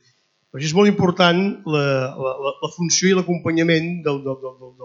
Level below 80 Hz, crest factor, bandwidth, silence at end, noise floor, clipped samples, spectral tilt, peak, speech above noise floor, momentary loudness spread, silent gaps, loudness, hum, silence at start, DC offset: -64 dBFS; 20 dB; 7.6 kHz; 0 s; -63 dBFS; under 0.1%; -4.5 dB/octave; 0 dBFS; 43 dB; 11 LU; none; -19 LUFS; none; 0.55 s; under 0.1%